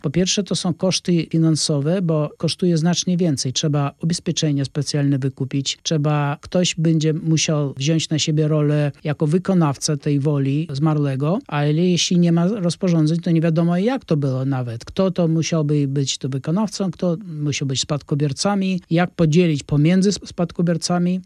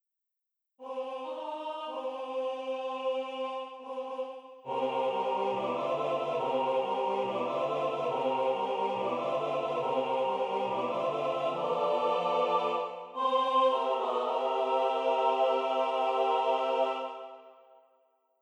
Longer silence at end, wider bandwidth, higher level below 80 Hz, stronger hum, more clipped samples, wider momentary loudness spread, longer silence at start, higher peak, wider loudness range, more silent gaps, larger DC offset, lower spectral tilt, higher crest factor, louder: second, 0.05 s vs 0.9 s; first, 11 kHz vs 9.8 kHz; first, -52 dBFS vs -84 dBFS; neither; neither; second, 5 LU vs 10 LU; second, 0.05 s vs 0.8 s; first, -4 dBFS vs -16 dBFS; second, 3 LU vs 7 LU; neither; neither; about the same, -5.5 dB/octave vs -5 dB/octave; about the same, 14 dB vs 16 dB; first, -20 LUFS vs -31 LUFS